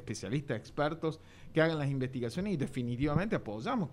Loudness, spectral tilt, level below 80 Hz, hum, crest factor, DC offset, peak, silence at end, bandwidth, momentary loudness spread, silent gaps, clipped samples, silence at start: -34 LUFS; -6.5 dB/octave; -54 dBFS; none; 20 dB; under 0.1%; -14 dBFS; 0 s; 12 kHz; 7 LU; none; under 0.1%; 0 s